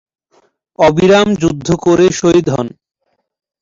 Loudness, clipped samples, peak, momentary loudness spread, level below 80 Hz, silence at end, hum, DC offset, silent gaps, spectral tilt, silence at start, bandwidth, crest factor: -12 LUFS; under 0.1%; 0 dBFS; 8 LU; -42 dBFS; 0.95 s; none; under 0.1%; none; -5.5 dB/octave; 0.8 s; 7.8 kHz; 12 dB